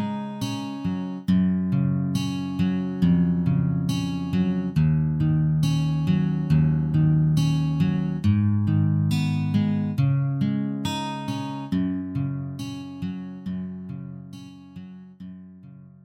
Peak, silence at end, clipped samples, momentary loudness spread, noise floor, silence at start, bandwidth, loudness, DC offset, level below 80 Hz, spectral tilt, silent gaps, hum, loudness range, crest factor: -10 dBFS; 0.15 s; under 0.1%; 15 LU; -45 dBFS; 0 s; 12 kHz; -24 LUFS; under 0.1%; -46 dBFS; -7.5 dB/octave; none; none; 9 LU; 14 dB